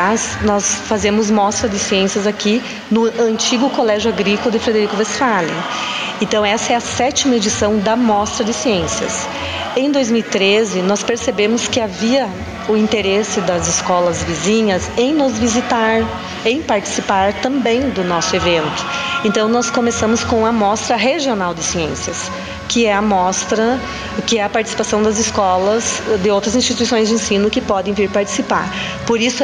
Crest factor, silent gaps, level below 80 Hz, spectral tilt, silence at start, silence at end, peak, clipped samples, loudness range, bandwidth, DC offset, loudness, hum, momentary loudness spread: 14 dB; none; -40 dBFS; -3.5 dB/octave; 0 s; 0 s; -2 dBFS; under 0.1%; 1 LU; 10.5 kHz; under 0.1%; -16 LUFS; none; 5 LU